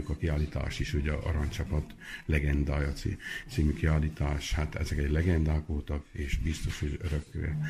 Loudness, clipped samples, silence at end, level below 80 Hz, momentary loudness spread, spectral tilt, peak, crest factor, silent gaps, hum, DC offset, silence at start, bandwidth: -32 LUFS; under 0.1%; 0 s; -34 dBFS; 7 LU; -6.5 dB/octave; -14 dBFS; 16 dB; none; none; under 0.1%; 0 s; 13.5 kHz